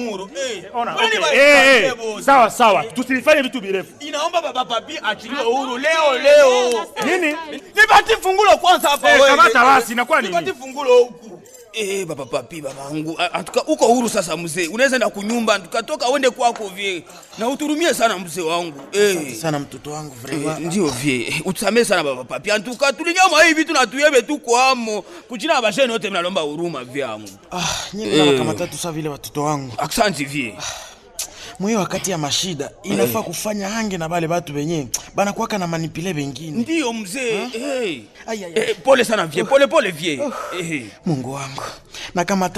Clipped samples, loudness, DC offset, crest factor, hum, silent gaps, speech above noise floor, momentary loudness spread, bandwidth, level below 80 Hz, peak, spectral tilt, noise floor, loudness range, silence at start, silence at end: under 0.1%; -17 LUFS; under 0.1%; 16 dB; none; none; 22 dB; 14 LU; 14 kHz; -52 dBFS; -2 dBFS; -3.5 dB/octave; -40 dBFS; 9 LU; 0 s; 0 s